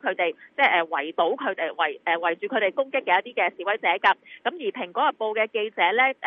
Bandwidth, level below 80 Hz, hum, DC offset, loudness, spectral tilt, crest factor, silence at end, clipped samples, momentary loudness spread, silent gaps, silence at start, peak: 6.2 kHz; -88 dBFS; none; under 0.1%; -24 LUFS; -5 dB/octave; 18 dB; 0 s; under 0.1%; 7 LU; none; 0.05 s; -6 dBFS